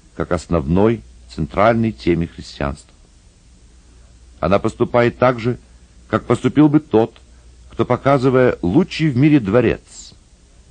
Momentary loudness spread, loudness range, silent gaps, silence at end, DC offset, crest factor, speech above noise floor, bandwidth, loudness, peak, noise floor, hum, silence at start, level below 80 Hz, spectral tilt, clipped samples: 13 LU; 6 LU; none; 0.65 s; under 0.1%; 16 dB; 32 dB; 9.6 kHz; -17 LUFS; 0 dBFS; -48 dBFS; none; 0.2 s; -38 dBFS; -7.5 dB/octave; under 0.1%